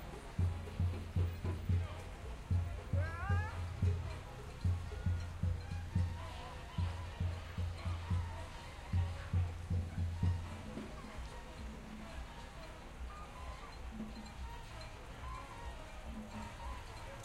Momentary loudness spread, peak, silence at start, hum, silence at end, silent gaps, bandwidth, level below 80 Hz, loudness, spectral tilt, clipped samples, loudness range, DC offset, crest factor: 12 LU; -24 dBFS; 0 s; none; 0 s; none; 12 kHz; -50 dBFS; -42 LUFS; -6.5 dB/octave; under 0.1%; 10 LU; under 0.1%; 16 dB